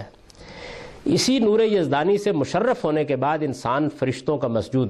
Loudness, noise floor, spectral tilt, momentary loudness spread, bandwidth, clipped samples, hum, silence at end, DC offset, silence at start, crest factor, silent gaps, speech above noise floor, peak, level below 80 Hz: -22 LUFS; -44 dBFS; -5.5 dB/octave; 17 LU; 13 kHz; under 0.1%; none; 0 s; under 0.1%; 0 s; 12 dB; none; 23 dB; -10 dBFS; -54 dBFS